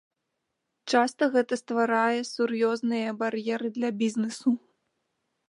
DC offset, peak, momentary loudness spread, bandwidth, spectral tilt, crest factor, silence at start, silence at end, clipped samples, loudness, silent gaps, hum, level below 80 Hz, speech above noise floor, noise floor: under 0.1%; -8 dBFS; 6 LU; 11 kHz; -4.5 dB/octave; 20 dB; 0.85 s; 0.9 s; under 0.1%; -27 LUFS; none; none; -82 dBFS; 55 dB; -81 dBFS